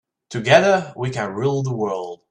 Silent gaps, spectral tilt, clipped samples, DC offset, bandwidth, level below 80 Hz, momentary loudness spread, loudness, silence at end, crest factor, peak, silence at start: none; -5.5 dB/octave; under 0.1%; under 0.1%; 10 kHz; -60 dBFS; 13 LU; -19 LUFS; 0.15 s; 20 dB; 0 dBFS; 0.3 s